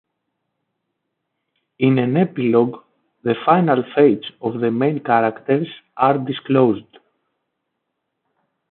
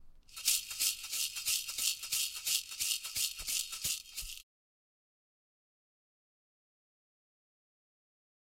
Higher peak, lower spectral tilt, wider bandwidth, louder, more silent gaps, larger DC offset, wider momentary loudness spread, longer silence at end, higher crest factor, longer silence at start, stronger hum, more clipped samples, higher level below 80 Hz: first, -2 dBFS vs -12 dBFS; first, -12 dB/octave vs 3 dB/octave; second, 4.3 kHz vs 16 kHz; first, -18 LUFS vs -33 LUFS; neither; neither; about the same, 8 LU vs 10 LU; second, 1.9 s vs 4.1 s; second, 18 dB vs 28 dB; first, 1.8 s vs 0 s; neither; neither; about the same, -66 dBFS vs -64 dBFS